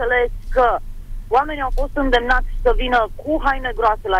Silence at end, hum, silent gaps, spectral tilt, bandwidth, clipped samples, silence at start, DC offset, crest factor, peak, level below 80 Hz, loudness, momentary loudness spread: 0 s; none; none; -6 dB/octave; 7.4 kHz; under 0.1%; 0 s; under 0.1%; 12 dB; -6 dBFS; -24 dBFS; -19 LUFS; 6 LU